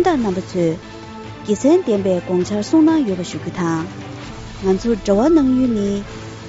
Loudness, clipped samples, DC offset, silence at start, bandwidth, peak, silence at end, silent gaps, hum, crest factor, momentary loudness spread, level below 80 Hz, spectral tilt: -17 LUFS; under 0.1%; under 0.1%; 0 s; 8 kHz; -2 dBFS; 0 s; none; none; 14 dB; 18 LU; -42 dBFS; -6.5 dB/octave